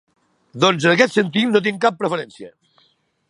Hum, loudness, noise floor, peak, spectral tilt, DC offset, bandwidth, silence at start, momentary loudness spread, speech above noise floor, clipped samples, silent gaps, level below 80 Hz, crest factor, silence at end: none; -17 LUFS; -62 dBFS; 0 dBFS; -5 dB/octave; under 0.1%; 11.5 kHz; 0.55 s; 9 LU; 44 dB; under 0.1%; none; -68 dBFS; 20 dB; 0.8 s